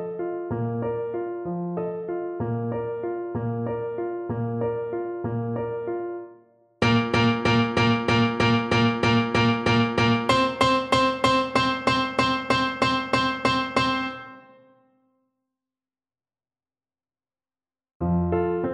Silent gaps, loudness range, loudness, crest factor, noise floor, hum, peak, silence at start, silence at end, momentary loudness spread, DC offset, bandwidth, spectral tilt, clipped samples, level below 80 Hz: 17.95-18.00 s; 9 LU; -24 LUFS; 18 dB; under -90 dBFS; none; -6 dBFS; 0 s; 0 s; 10 LU; under 0.1%; 10.5 kHz; -6 dB/octave; under 0.1%; -50 dBFS